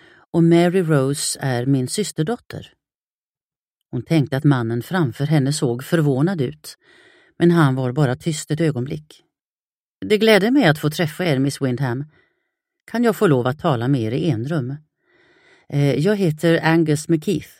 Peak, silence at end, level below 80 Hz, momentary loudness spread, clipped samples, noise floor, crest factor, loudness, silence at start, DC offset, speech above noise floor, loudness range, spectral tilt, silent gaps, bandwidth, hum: 0 dBFS; 0.15 s; -58 dBFS; 13 LU; under 0.1%; under -90 dBFS; 20 dB; -19 LUFS; 0.35 s; under 0.1%; over 72 dB; 3 LU; -6 dB/octave; 2.95-3.34 s, 3.43-3.50 s, 3.56-3.81 s, 9.41-10.00 s; 16 kHz; none